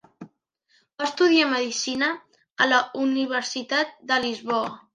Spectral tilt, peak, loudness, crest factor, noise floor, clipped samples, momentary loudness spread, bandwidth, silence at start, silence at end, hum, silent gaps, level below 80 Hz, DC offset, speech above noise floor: -2 dB/octave; -6 dBFS; -23 LUFS; 20 dB; -67 dBFS; under 0.1%; 8 LU; 10.5 kHz; 0.2 s; 0.15 s; none; 2.52-2.56 s; -72 dBFS; under 0.1%; 43 dB